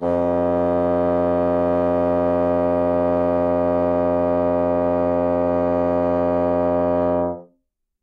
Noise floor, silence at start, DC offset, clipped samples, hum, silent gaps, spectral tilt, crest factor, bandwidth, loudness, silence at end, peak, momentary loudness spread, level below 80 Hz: -70 dBFS; 0 s; under 0.1%; under 0.1%; none; none; -10 dB/octave; 10 dB; 4.9 kHz; -19 LUFS; 0.6 s; -10 dBFS; 1 LU; -46 dBFS